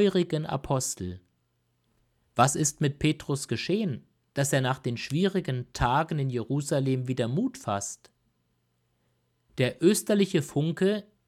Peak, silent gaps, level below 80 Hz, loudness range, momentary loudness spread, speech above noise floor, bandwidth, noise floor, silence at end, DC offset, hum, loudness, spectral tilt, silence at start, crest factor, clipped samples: -6 dBFS; none; -52 dBFS; 3 LU; 9 LU; 46 dB; 16 kHz; -73 dBFS; 0.25 s; under 0.1%; none; -28 LUFS; -5 dB/octave; 0 s; 22 dB; under 0.1%